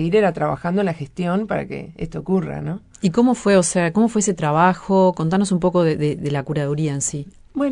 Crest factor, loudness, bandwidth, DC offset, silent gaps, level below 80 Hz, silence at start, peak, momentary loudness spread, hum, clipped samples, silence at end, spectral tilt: 18 dB; -19 LUFS; 11 kHz; under 0.1%; none; -48 dBFS; 0 s; -2 dBFS; 12 LU; none; under 0.1%; 0 s; -6 dB/octave